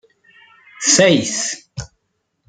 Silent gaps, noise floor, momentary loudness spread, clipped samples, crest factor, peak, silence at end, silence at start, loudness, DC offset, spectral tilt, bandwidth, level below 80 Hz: none; -71 dBFS; 21 LU; under 0.1%; 20 dB; 0 dBFS; 0.6 s; 0.8 s; -15 LUFS; under 0.1%; -2.5 dB/octave; 10 kHz; -52 dBFS